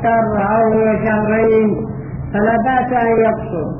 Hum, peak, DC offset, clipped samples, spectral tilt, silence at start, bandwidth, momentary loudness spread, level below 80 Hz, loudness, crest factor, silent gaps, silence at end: none; -4 dBFS; under 0.1%; under 0.1%; -7 dB/octave; 0 s; 3.3 kHz; 9 LU; -38 dBFS; -15 LUFS; 12 dB; none; 0 s